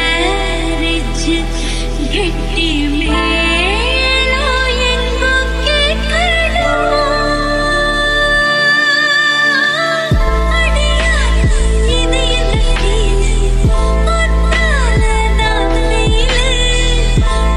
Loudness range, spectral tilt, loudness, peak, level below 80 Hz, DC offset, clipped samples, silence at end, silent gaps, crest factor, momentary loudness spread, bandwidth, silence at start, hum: 3 LU; -4 dB/octave; -13 LUFS; -2 dBFS; -16 dBFS; under 0.1%; under 0.1%; 0 s; none; 10 dB; 6 LU; 11.5 kHz; 0 s; none